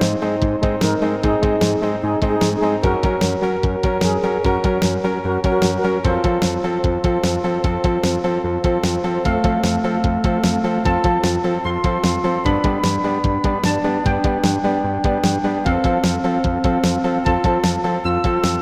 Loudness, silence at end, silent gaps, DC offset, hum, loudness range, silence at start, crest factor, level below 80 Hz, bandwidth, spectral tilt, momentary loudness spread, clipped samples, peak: -19 LUFS; 0 s; none; under 0.1%; none; 1 LU; 0 s; 16 dB; -28 dBFS; 15 kHz; -6 dB/octave; 3 LU; under 0.1%; -2 dBFS